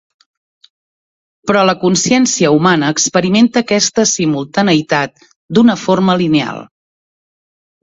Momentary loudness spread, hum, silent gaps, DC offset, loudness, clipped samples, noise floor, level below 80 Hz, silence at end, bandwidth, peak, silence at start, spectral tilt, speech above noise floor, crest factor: 6 LU; none; 5.36-5.49 s; under 0.1%; -12 LUFS; under 0.1%; under -90 dBFS; -52 dBFS; 1.2 s; 7.8 kHz; 0 dBFS; 1.45 s; -4 dB/octave; over 78 dB; 14 dB